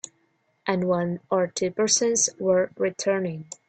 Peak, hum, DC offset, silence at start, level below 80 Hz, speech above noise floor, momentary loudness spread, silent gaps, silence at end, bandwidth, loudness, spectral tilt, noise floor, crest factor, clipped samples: -6 dBFS; none; under 0.1%; 0.65 s; -68 dBFS; 44 dB; 8 LU; none; 0.15 s; 9.2 kHz; -24 LUFS; -3.5 dB/octave; -69 dBFS; 18 dB; under 0.1%